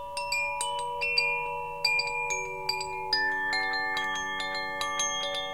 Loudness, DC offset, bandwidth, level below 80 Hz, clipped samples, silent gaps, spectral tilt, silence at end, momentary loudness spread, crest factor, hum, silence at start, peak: -28 LUFS; 0.3%; 17 kHz; -58 dBFS; under 0.1%; none; 0 dB/octave; 0 s; 6 LU; 20 dB; none; 0 s; -10 dBFS